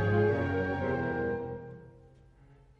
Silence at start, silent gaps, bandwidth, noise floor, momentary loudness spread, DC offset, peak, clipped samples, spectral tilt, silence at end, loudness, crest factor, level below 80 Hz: 0 s; none; 6.4 kHz; -58 dBFS; 18 LU; under 0.1%; -16 dBFS; under 0.1%; -9 dB/octave; 0.8 s; -31 LUFS; 16 dB; -56 dBFS